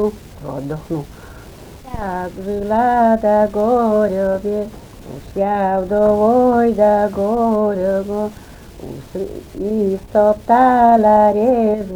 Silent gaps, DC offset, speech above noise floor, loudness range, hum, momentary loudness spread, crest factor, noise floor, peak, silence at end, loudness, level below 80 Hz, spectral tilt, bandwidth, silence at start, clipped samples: none; under 0.1%; 21 dB; 4 LU; none; 17 LU; 14 dB; -37 dBFS; -2 dBFS; 0 s; -16 LUFS; -40 dBFS; -8 dB/octave; over 20 kHz; 0 s; under 0.1%